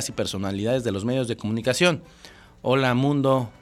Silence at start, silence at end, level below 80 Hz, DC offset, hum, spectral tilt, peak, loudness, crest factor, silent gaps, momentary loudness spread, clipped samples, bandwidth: 0 s; 0.1 s; -56 dBFS; under 0.1%; none; -5 dB/octave; -6 dBFS; -24 LUFS; 18 dB; none; 7 LU; under 0.1%; 15 kHz